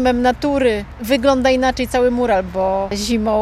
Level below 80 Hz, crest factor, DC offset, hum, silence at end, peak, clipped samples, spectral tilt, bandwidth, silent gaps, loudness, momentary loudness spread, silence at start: -34 dBFS; 14 dB; under 0.1%; none; 0 s; -2 dBFS; under 0.1%; -5 dB/octave; 15.5 kHz; none; -17 LUFS; 5 LU; 0 s